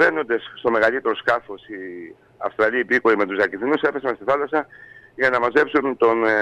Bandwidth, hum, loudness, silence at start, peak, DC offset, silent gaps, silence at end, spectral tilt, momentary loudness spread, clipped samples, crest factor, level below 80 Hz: 8.6 kHz; none; -20 LUFS; 0 s; -6 dBFS; under 0.1%; none; 0 s; -5.5 dB/octave; 16 LU; under 0.1%; 14 dB; -62 dBFS